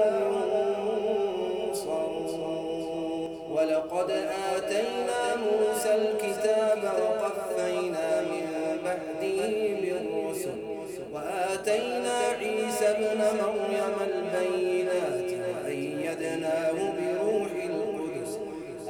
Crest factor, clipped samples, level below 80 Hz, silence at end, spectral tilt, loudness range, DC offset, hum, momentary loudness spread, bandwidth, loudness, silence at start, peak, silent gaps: 16 dB; under 0.1%; -66 dBFS; 0 s; -4 dB/octave; 3 LU; under 0.1%; none; 7 LU; 20 kHz; -29 LUFS; 0 s; -14 dBFS; none